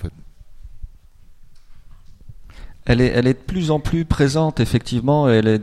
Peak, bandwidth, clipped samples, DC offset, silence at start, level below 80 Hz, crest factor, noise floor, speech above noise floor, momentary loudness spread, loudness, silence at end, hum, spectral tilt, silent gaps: -2 dBFS; 13 kHz; under 0.1%; under 0.1%; 0 s; -34 dBFS; 18 dB; -44 dBFS; 27 dB; 6 LU; -18 LUFS; 0 s; none; -7 dB/octave; none